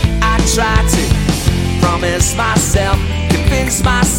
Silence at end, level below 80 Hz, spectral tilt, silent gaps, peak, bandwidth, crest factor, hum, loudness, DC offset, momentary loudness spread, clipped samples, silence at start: 0 s; -18 dBFS; -4.5 dB/octave; none; 0 dBFS; 17 kHz; 12 dB; none; -13 LUFS; under 0.1%; 3 LU; under 0.1%; 0 s